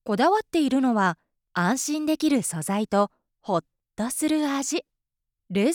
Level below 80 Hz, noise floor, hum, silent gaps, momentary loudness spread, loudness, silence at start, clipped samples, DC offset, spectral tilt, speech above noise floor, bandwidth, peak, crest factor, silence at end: -66 dBFS; -83 dBFS; none; none; 9 LU; -25 LUFS; 0.05 s; under 0.1%; under 0.1%; -4.5 dB/octave; 59 dB; 19 kHz; -10 dBFS; 16 dB; 0 s